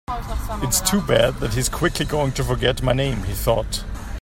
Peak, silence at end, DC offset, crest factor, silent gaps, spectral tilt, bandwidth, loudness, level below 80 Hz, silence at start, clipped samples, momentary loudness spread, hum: -2 dBFS; 0 s; under 0.1%; 18 dB; none; -4 dB/octave; 16.5 kHz; -21 LUFS; -30 dBFS; 0.1 s; under 0.1%; 10 LU; none